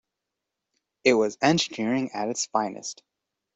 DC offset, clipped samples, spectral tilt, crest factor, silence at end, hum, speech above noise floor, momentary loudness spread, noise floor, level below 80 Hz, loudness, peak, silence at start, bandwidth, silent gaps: under 0.1%; under 0.1%; -4 dB/octave; 22 dB; 0.65 s; none; 60 dB; 14 LU; -85 dBFS; -68 dBFS; -25 LUFS; -6 dBFS; 1.05 s; 8.2 kHz; none